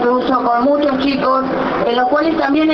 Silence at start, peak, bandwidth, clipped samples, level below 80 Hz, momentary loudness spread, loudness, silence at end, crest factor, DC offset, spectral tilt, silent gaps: 0 s; -4 dBFS; 6.2 kHz; under 0.1%; -46 dBFS; 2 LU; -15 LUFS; 0 s; 12 dB; under 0.1%; -7 dB/octave; none